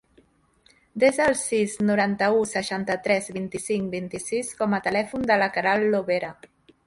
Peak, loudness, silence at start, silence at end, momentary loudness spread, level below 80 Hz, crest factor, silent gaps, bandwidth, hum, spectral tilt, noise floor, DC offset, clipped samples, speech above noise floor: -6 dBFS; -24 LUFS; 0.95 s; 0.55 s; 8 LU; -60 dBFS; 20 dB; none; 11.5 kHz; none; -4.5 dB/octave; -61 dBFS; under 0.1%; under 0.1%; 38 dB